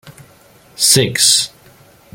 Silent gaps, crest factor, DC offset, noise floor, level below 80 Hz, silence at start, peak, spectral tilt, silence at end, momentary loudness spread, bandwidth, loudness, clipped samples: none; 18 dB; under 0.1%; -46 dBFS; -56 dBFS; 0.05 s; 0 dBFS; -1.5 dB/octave; 0.65 s; 6 LU; over 20 kHz; -11 LUFS; under 0.1%